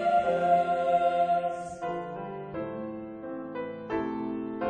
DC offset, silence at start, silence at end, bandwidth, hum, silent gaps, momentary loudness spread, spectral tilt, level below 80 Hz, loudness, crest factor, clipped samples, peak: under 0.1%; 0 s; 0 s; 9.4 kHz; none; none; 13 LU; -7 dB/octave; -62 dBFS; -30 LUFS; 16 dB; under 0.1%; -12 dBFS